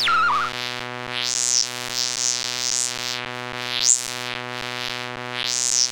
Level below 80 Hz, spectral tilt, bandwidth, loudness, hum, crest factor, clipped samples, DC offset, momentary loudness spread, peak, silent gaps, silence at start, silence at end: -64 dBFS; 0.5 dB/octave; 17 kHz; -22 LUFS; none; 24 dB; under 0.1%; under 0.1%; 11 LU; 0 dBFS; none; 0 s; 0 s